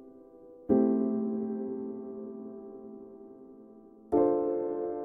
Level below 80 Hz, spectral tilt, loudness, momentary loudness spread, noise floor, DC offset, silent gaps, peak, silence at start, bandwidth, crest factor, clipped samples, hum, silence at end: -66 dBFS; -12 dB/octave; -30 LUFS; 23 LU; -53 dBFS; under 0.1%; none; -12 dBFS; 0 s; 2.5 kHz; 20 dB; under 0.1%; none; 0 s